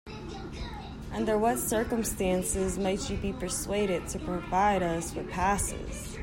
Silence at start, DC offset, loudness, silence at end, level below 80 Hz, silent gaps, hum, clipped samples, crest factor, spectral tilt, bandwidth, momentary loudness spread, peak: 0.05 s; under 0.1%; -30 LUFS; 0 s; -42 dBFS; none; none; under 0.1%; 16 dB; -4.5 dB/octave; 16.5 kHz; 13 LU; -14 dBFS